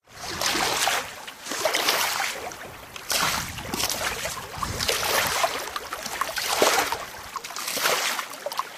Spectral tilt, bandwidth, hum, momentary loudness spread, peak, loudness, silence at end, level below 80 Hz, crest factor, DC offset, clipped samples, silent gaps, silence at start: -1 dB/octave; 15.5 kHz; none; 12 LU; -4 dBFS; -25 LUFS; 0 s; -52 dBFS; 24 dB; under 0.1%; under 0.1%; none; 0.1 s